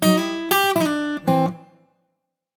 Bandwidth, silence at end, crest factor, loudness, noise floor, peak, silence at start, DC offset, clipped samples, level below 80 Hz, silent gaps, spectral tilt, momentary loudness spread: over 20 kHz; 0.95 s; 16 dB; -20 LUFS; -76 dBFS; -4 dBFS; 0 s; under 0.1%; under 0.1%; -62 dBFS; none; -4.5 dB/octave; 7 LU